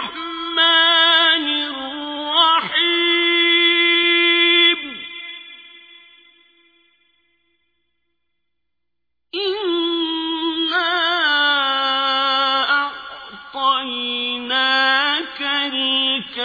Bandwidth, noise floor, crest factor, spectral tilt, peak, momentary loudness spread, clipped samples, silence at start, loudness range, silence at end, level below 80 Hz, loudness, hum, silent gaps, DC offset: 5 kHz; -83 dBFS; 18 dB; -3 dB/octave; -2 dBFS; 15 LU; under 0.1%; 0 s; 11 LU; 0 s; -64 dBFS; -16 LUFS; 60 Hz at -80 dBFS; none; under 0.1%